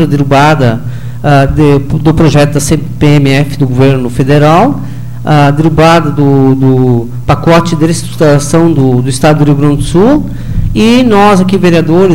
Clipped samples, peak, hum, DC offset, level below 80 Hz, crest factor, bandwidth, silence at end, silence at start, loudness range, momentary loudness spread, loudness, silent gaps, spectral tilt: 0.2%; 0 dBFS; none; 9%; -24 dBFS; 8 dB; 16.5 kHz; 0 s; 0 s; 1 LU; 6 LU; -7 LUFS; none; -6.5 dB/octave